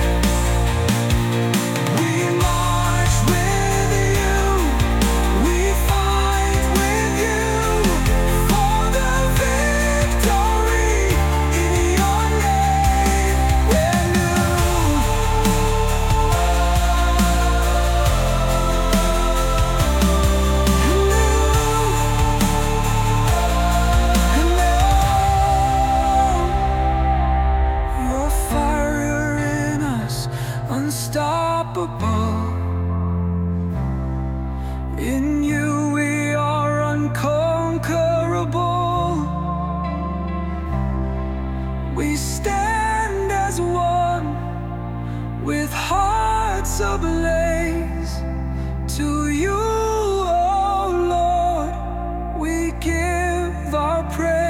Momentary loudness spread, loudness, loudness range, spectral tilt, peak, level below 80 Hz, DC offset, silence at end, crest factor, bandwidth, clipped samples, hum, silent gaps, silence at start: 7 LU; -19 LUFS; 5 LU; -5 dB/octave; -4 dBFS; -22 dBFS; under 0.1%; 0 s; 14 dB; 17 kHz; under 0.1%; none; none; 0 s